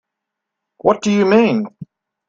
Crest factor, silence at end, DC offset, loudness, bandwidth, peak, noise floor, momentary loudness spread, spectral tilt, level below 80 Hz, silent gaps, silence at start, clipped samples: 18 dB; 0.45 s; under 0.1%; -15 LUFS; 7.8 kHz; 0 dBFS; -80 dBFS; 9 LU; -6 dB/octave; -58 dBFS; none; 0.85 s; under 0.1%